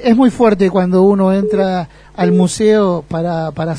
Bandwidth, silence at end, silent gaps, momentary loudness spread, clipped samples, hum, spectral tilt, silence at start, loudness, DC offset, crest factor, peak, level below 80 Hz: 10.5 kHz; 0 s; none; 8 LU; under 0.1%; none; -7 dB/octave; 0 s; -13 LUFS; under 0.1%; 12 dB; 0 dBFS; -44 dBFS